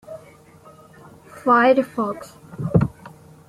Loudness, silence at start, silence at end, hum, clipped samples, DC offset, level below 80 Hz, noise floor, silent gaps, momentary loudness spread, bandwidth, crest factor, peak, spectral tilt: -20 LUFS; 0.1 s; 0.4 s; none; under 0.1%; under 0.1%; -46 dBFS; -47 dBFS; none; 25 LU; 13 kHz; 20 dB; -2 dBFS; -8 dB/octave